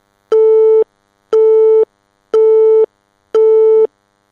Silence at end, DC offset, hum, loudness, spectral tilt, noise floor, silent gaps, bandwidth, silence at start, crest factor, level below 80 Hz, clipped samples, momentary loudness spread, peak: 0.45 s; under 0.1%; none; -11 LUFS; -4.5 dB/octave; -36 dBFS; none; 3.3 kHz; 0.3 s; 8 dB; -72 dBFS; under 0.1%; 9 LU; -2 dBFS